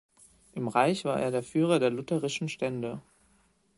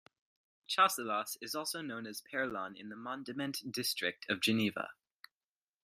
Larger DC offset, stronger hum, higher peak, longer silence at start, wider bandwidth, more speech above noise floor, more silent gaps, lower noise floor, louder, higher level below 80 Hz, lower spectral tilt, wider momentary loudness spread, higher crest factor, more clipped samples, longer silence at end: neither; neither; first, -8 dBFS vs -14 dBFS; second, 0.55 s vs 0.7 s; second, 11.5 kHz vs 15.5 kHz; second, 39 dB vs over 53 dB; neither; second, -67 dBFS vs under -90 dBFS; first, -29 LUFS vs -36 LUFS; first, -68 dBFS vs -80 dBFS; first, -5.5 dB/octave vs -3 dB/octave; second, 11 LU vs 14 LU; about the same, 22 dB vs 24 dB; neither; second, 0.75 s vs 0.9 s